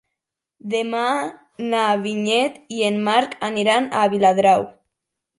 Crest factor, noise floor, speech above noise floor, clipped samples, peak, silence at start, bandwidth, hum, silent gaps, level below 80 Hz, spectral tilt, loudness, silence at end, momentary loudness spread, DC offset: 16 dB; -83 dBFS; 63 dB; under 0.1%; -4 dBFS; 0.65 s; 11.5 kHz; none; none; -66 dBFS; -4.5 dB/octave; -19 LUFS; 0.65 s; 9 LU; under 0.1%